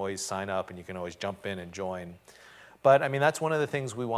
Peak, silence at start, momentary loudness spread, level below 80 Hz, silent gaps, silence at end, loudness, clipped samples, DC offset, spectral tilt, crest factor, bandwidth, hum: -8 dBFS; 0 s; 16 LU; -60 dBFS; none; 0 s; -29 LUFS; under 0.1%; under 0.1%; -4.5 dB/octave; 20 dB; 15.5 kHz; none